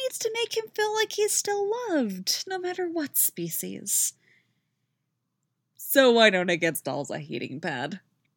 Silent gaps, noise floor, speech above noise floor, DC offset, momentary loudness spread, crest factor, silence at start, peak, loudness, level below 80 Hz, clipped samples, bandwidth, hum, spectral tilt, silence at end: none; -79 dBFS; 53 dB; under 0.1%; 13 LU; 22 dB; 0 s; -4 dBFS; -25 LUFS; -90 dBFS; under 0.1%; over 20 kHz; none; -2.5 dB/octave; 0.4 s